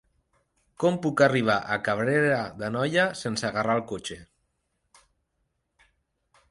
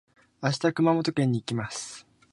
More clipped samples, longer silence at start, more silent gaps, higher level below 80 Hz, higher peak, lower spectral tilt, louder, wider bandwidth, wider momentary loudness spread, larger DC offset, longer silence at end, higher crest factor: neither; first, 0.8 s vs 0.4 s; neither; about the same, -62 dBFS vs -64 dBFS; about the same, -8 dBFS vs -10 dBFS; about the same, -5.5 dB/octave vs -5.5 dB/octave; about the same, -25 LUFS vs -27 LUFS; about the same, 11.5 kHz vs 11.5 kHz; about the same, 11 LU vs 13 LU; neither; first, 2.25 s vs 0.3 s; about the same, 20 dB vs 18 dB